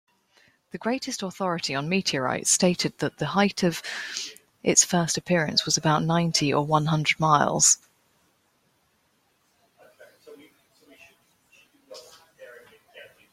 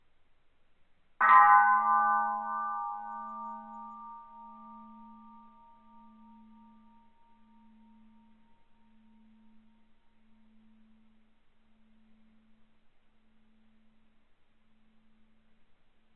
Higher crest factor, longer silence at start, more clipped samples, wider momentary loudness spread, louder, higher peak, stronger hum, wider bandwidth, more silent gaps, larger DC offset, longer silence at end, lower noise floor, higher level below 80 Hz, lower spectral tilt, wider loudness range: about the same, 22 dB vs 26 dB; second, 0.75 s vs 1.2 s; neither; second, 13 LU vs 30 LU; about the same, -23 LUFS vs -25 LUFS; first, -4 dBFS vs -8 dBFS; neither; first, 16 kHz vs 4.2 kHz; neither; neither; second, 0.25 s vs 11.4 s; first, -68 dBFS vs -63 dBFS; first, -64 dBFS vs -72 dBFS; first, -3 dB/octave vs -0.5 dB/octave; second, 4 LU vs 25 LU